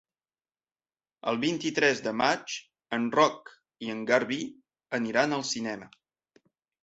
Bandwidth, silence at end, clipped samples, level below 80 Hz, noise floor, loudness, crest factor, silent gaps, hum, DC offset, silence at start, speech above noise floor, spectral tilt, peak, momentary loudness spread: 8.2 kHz; 0.95 s; under 0.1%; -72 dBFS; under -90 dBFS; -28 LUFS; 22 dB; none; none; under 0.1%; 1.25 s; over 62 dB; -3.5 dB/octave; -8 dBFS; 13 LU